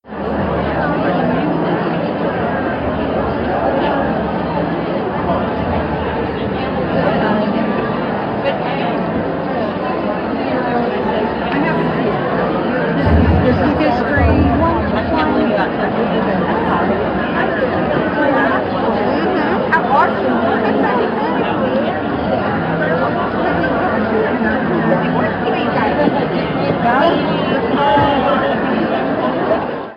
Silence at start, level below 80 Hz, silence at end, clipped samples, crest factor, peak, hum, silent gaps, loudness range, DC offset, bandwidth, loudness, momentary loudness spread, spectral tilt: 0.05 s; -32 dBFS; 0 s; under 0.1%; 14 dB; -2 dBFS; none; none; 3 LU; under 0.1%; 5.8 kHz; -16 LUFS; 5 LU; -9 dB/octave